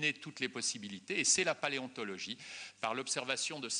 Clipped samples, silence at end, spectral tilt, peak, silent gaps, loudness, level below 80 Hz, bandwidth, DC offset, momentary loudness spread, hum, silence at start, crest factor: under 0.1%; 0 s; -1 dB/octave; -16 dBFS; none; -35 LUFS; -82 dBFS; 10 kHz; under 0.1%; 13 LU; none; 0 s; 22 dB